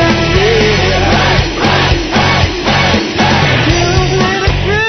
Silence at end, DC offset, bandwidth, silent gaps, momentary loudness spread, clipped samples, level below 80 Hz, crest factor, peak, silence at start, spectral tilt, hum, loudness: 0 s; 0.4%; 6.4 kHz; none; 2 LU; under 0.1%; -22 dBFS; 10 dB; 0 dBFS; 0 s; -5 dB/octave; none; -10 LUFS